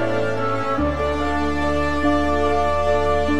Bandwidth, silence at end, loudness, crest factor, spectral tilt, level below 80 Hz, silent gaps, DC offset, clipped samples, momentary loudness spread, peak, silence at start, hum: 12 kHz; 0 s; -20 LUFS; 12 dB; -6.5 dB/octave; -32 dBFS; none; 4%; under 0.1%; 3 LU; -8 dBFS; 0 s; none